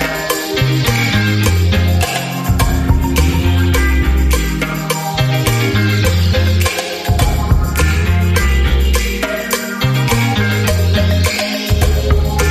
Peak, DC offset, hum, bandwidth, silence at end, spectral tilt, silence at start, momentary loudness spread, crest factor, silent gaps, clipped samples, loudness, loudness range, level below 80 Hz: 0 dBFS; under 0.1%; none; 15.5 kHz; 0 s; -5 dB/octave; 0 s; 4 LU; 14 dB; none; under 0.1%; -14 LUFS; 1 LU; -18 dBFS